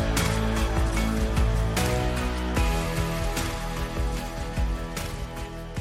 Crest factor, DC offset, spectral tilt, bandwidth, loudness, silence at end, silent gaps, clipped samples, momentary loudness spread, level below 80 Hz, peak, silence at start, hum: 16 dB; under 0.1%; -5 dB/octave; 16 kHz; -28 LUFS; 0 s; none; under 0.1%; 8 LU; -28 dBFS; -10 dBFS; 0 s; none